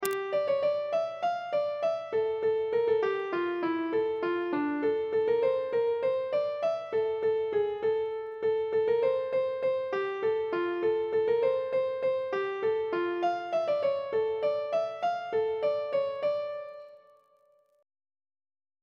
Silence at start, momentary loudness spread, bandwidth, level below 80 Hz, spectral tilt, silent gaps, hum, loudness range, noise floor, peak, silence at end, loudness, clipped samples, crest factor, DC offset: 0 s; 4 LU; 16 kHz; -72 dBFS; -5 dB/octave; none; none; 2 LU; -66 dBFS; -6 dBFS; 1.85 s; -29 LUFS; under 0.1%; 22 dB; under 0.1%